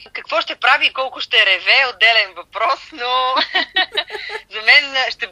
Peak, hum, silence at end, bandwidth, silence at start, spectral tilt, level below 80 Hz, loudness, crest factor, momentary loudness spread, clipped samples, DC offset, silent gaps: 0 dBFS; none; 0 s; 11.5 kHz; 0 s; 0 dB/octave; -62 dBFS; -15 LUFS; 18 dB; 11 LU; under 0.1%; under 0.1%; none